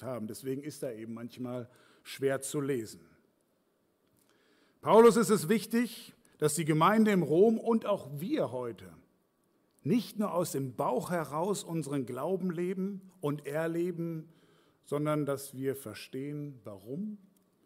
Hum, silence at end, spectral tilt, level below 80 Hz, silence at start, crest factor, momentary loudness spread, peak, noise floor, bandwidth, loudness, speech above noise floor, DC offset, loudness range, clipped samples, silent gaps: none; 0.5 s; -6 dB/octave; -76 dBFS; 0 s; 20 dB; 17 LU; -12 dBFS; -74 dBFS; 16 kHz; -31 LUFS; 43 dB; under 0.1%; 10 LU; under 0.1%; none